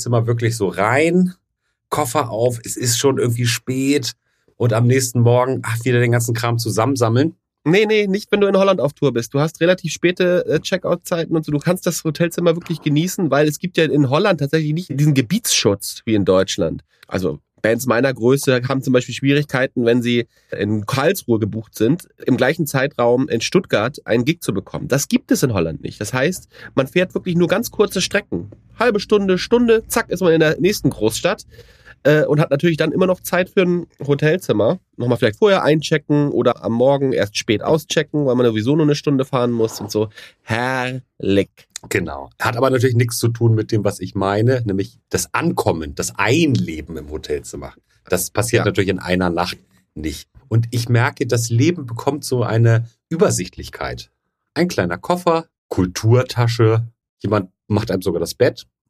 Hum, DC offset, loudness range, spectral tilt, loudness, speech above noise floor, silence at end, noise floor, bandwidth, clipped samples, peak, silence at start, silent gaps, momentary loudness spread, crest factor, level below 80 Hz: none; under 0.1%; 3 LU; -5.5 dB/octave; -18 LUFS; 55 dB; 0.25 s; -73 dBFS; 15.5 kHz; under 0.1%; -2 dBFS; 0 s; 55.58-55.69 s, 57.09-57.17 s; 8 LU; 16 dB; -48 dBFS